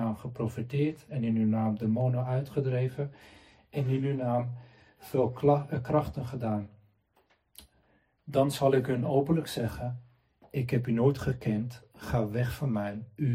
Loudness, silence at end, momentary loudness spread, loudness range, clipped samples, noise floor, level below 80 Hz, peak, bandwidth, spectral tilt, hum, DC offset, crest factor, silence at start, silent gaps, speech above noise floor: -30 LUFS; 0 s; 12 LU; 3 LU; under 0.1%; -69 dBFS; -56 dBFS; -10 dBFS; 16 kHz; -8 dB/octave; none; under 0.1%; 20 dB; 0 s; none; 40 dB